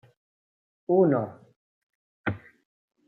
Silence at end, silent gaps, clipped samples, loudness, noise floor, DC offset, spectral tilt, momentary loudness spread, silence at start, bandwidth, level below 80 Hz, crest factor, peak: 0.7 s; 1.56-2.24 s; under 0.1%; -26 LUFS; under -90 dBFS; under 0.1%; -11 dB/octave; 19 LU; 0.9 s; 3.9 kHz; -68 dBFS; 20 dB; -10 dBFS